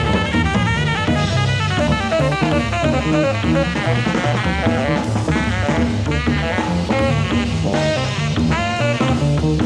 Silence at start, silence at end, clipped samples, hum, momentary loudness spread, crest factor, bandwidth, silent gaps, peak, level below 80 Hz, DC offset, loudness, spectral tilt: 0 s; 0 s; under 0.1%; none; 2 LU; 12 dB; 11 kHz; none; -4 dBFS; -30 dBFS; under 0.1%; -18 LUFS; -6 dB/octave